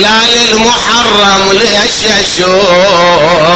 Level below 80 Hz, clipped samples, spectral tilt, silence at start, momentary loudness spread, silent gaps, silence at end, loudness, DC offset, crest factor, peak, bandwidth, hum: -34 dBFS; 0.4%; -2.5 dB/octave; 0 s; 3 LU; none; 0 s; -6 LUFS; under 0.1%; 6 dB; 0 dBFS; 12 kHz; none